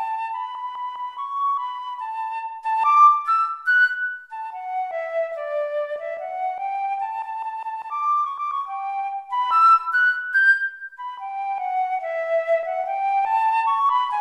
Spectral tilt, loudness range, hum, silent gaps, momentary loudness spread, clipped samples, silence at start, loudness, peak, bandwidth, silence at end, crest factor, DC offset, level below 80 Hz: 0.5 dB/octave; 7 LU; none; none; 14 LU; under 0.1%; 0 s; -22 LUFS; -6 dBFS; 12 kHz; 0 s; 16 dB; under 0.1%; -80 dBFS